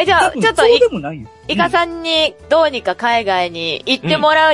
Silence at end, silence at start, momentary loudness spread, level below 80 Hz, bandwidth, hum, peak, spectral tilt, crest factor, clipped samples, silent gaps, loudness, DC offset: 0 s; 0 s; 9 LU; -46 dBFS; 11.5 kHz; none; 0 dBFS; -4 dB/octave; 14 dB; under 0.1%; none; -14 LUFS; under 0.1%